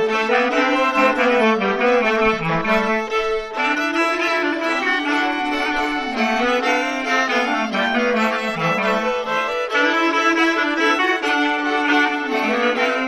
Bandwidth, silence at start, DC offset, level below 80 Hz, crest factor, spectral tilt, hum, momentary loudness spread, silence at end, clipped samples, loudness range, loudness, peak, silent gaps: 15 kHz; 0 s; under 0.1%; -48 dBFS; 16 dB; -4 dB/octave; none; 4 LU; 0 s; under 0.1%; 2 LU; -18 LUFS; -2 dBFS; none